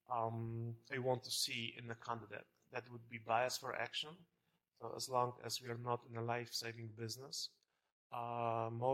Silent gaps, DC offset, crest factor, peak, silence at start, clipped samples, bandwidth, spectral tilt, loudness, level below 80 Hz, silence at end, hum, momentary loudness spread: 7.92-8.10 s; under 0.1%; 22 dB; -22 dBFS; 0.1 s; under 0.1%; 16.5 kHz; -3.5 dB/octave; -43 LUFS; -84 dBFS; 0 s; none; 12 LU